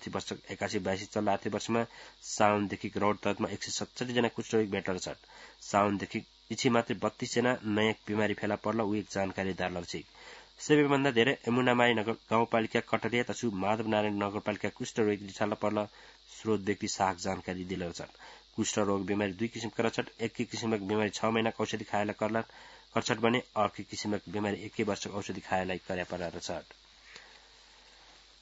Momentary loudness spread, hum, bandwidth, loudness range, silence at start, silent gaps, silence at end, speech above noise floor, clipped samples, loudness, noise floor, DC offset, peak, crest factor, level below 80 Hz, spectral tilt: 12 LU; none; 8 kHz; 6 LU; 0 s; none; 1.15 s; 26 dB; under 0.1%; -32 LUFS; -58 dBFS; under 0.1%; -8 dBFS; 24 dB; -68 dBFS; -4 dB/octave